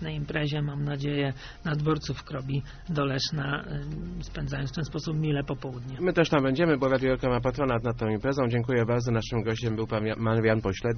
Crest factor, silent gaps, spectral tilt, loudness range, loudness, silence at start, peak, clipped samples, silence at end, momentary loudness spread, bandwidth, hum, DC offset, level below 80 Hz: 20 dB; none; -5.5 dB/octave; 5 LU; -28 LUFS; 0 s; -8 dBFS; under 0.1%; 0 s; 10 LU; 6.6 kHz; none; under 0.1%; -44 dBFS